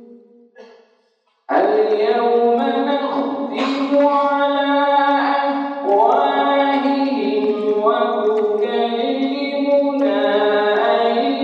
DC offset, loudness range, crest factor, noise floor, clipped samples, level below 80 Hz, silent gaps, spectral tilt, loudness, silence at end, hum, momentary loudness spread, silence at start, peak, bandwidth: under 0.1%; 2 LU; 14 dB; -63 dBFS; under 0.1%; -84 dBFS; none; -5.5 dB/octave; -17 LUFS; 0 s; none; 5 LU; 0 s; -2 dBFS; 7.4 kHz